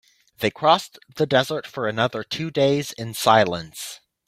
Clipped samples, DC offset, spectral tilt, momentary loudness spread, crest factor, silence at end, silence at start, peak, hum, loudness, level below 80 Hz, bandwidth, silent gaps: under 0.1%; under 0.1%; -4.5 dB/octave; 13 LU; 22 dB; 0.3 s; 0.4 s; -2 dBFS; none; -22 LUFS; -60 dBFS; 16 kHz; none